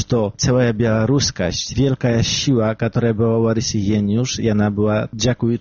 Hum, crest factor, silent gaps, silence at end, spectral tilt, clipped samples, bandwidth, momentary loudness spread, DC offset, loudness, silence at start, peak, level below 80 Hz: none; 10 dB; none; 0 s; -6 dB/octave; under 0.1%; 7.2 kHz; 3 LU; under 0.1%; -18 LUFS; 0 s; -6 dBFS; -40 dBFS